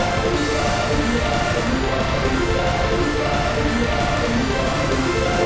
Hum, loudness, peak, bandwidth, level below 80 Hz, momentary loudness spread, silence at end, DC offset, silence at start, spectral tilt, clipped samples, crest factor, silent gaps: none; -20 LUFS; -6 dBFS; 8 kHz; -28 dBFS; 1 LU; 0 s; under 0.1%; 0 s; -5 dB/octave; under 0.1%; 14 dB; none